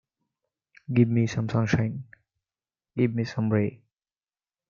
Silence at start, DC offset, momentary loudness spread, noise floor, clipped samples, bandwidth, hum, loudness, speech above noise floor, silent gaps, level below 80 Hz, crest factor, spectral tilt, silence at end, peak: 0.9 s; under 0.1%; 9 LU; under -90 dBFS; under 0.1%; 7.2 kHz; none; -26 LUFS; over 66 dB; none; -58 dBFS; 20 dB; -8 dB/octave; 0.95 s; -8 dBFS